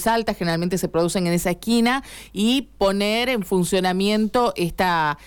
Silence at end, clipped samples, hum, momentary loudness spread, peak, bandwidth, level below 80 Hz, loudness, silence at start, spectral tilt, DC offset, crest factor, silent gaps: 0 s; under 0.1%; none; 3 LU; -10 dBFS; 18 kHz; -44 dBFS; -21 LUFS; 0 s; -5 dB/octave; under 0.1%; 12 dB; none